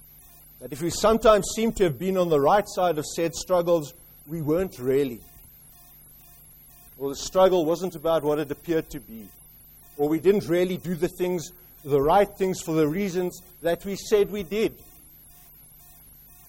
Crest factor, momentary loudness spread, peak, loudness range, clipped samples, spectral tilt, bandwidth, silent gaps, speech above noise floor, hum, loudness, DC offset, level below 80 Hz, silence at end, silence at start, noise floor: 20 dB; 14 LU; -4 dBFS; 6 LU; under 0.1%; -5.5 dB/octave; 16.5 kHz; none; 27 dB; none; -24 LUFS; under 0.1%; -48 dBFS; 1.75 s; 0.6 s; -50 dBFS